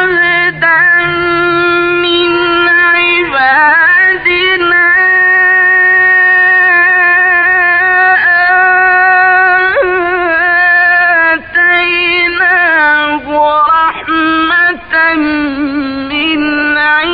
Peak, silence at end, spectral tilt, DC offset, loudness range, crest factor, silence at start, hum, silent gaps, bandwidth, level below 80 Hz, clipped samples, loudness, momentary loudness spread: 0 dBFS; 0 s; -9.5 dB/octave; under 0.1%; 4 LU; 8 dB; 0 s; none; none; 5.2 kHz; -42 dBFS; under 0.1%; -7 LUFS; 6 LU